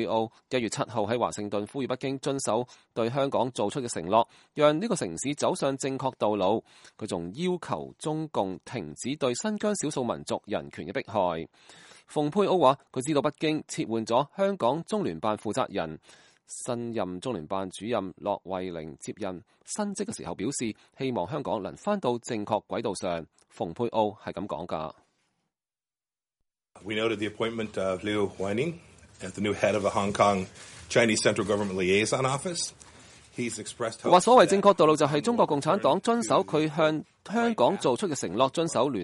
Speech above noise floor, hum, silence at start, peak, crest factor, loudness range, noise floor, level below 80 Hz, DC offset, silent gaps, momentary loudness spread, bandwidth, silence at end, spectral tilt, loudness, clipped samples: over 62 dB; none; 0 s; -6 dBFS; 22 dB; 10 LU; under -90 dBFS; -64 dBFS; under 0.1%; none; 11 LU; 11.5 kHz; 0 s; -4.5 dB/octave; -28 LUFS; under 0.1%